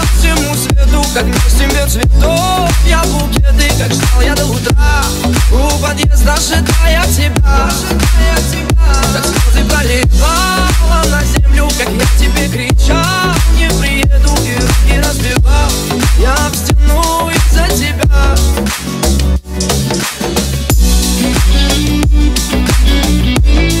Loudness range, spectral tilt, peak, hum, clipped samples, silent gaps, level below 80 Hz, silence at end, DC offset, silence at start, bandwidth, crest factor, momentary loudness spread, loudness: 1 LU; -4.5 dB/octave; 0 dBFS; none; under 0.1%; none; -12 dBFS; 0 s; under 0.1%; 0 s; 16 kHz; 10 dB; 2 LU; -11 LUFS